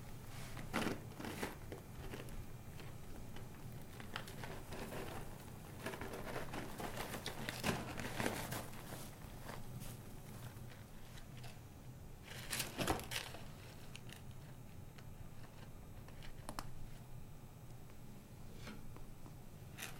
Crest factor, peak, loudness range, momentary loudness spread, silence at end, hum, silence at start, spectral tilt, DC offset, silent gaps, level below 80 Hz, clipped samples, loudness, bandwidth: 26 dB; -20 dBFS; 10 LU; 14 LU; 0 s; none; 0 s; -4 dB/octave; under 0.1%; none; -56 dBFS; under 0.1%; -48 LUFS; 16.5 kHz